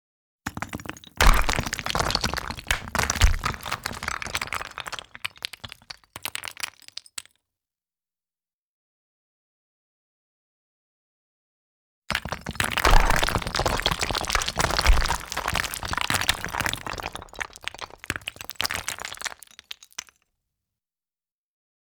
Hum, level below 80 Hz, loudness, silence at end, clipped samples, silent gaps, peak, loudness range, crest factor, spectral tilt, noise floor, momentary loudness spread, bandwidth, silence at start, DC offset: none; -32 dBFS; -26 LUFS; 2.25 s; under 0.1%; 8.53-12.02 s; -2 dBFS; 14 LU; 24 dB; -2.5 dB/octave; under -90 dBFS; 16 LU; over 20 kHz; 0.45 s; under 0.1%